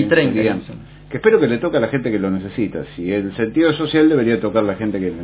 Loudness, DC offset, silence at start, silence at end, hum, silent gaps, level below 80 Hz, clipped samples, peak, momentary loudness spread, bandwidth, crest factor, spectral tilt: -18 LUFS; under 0.1%; 0 s; 0 s; none; none; -46 dBFS; under 0.1%; 0 dBFS; 10 LU; 4 kHz; 18 dB; -11 dB/octave